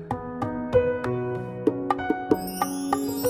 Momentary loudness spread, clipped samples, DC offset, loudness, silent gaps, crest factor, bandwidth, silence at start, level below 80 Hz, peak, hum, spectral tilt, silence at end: 7 LU; under 0.1%; under 0.1%; -27 LUFS; none; 20 dB; 16.5 kHz; 0 s; -50 dBFS; -6 dBFS; none; -6 dB/octave; 0 s